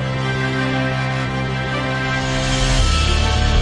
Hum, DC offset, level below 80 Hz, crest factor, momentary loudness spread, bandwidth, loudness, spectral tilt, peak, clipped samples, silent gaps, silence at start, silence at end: none; under 0.1%; -24 dBFS; 14 dB; 4 LU; 11.5 kHz; -19 LUFS; -4.5 dB/octave; -4 dBFS; under 0.1%; none; 0 s; 0 s